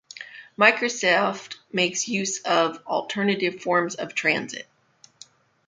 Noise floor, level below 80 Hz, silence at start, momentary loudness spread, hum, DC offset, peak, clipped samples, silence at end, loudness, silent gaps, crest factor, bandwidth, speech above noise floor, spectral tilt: -57 dBFS; -74 dBFS; 0.15 s; 17 LU; none; under 0.1%; -2 dBFS; under 0.1%; 1.05 s; -23 LUFS; none; 24 dB; 9.6 kHz; 34 dB; -3 dB/octave